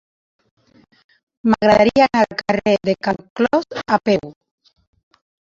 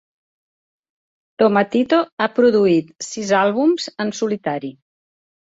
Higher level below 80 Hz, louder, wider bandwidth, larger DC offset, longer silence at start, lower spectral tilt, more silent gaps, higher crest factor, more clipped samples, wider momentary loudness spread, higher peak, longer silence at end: first, -50 dBFS vs -64 dBFS; about the same, -17 LUFS vs -18 LUFS; about the same, 7.6 kHz vs 8 kHz; neither; about the same, 1.45 s vs 1.4 s; about the same, -6 dB/octave vs -5 dB/octave; about the same, 3.30-3.36 s vs 2.12-2.17 s; about the same, 18 dB vs 16 dB; neither; about the same, 9 LU vs 11 LU; about the same, -2 dBFS vs -2 dBFS; first, 1.1 s vs 0.85 s